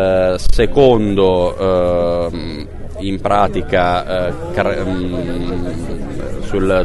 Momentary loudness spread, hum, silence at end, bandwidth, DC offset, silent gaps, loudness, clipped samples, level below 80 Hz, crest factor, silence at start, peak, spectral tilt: 13 LU; none; 0 s; 11.5 kHz; under 0.1%; none; -16 LUFS; under 0.1%; -24 dBFS; 14 dB; 0 s; 0 dBFS; -6.5 dB/octave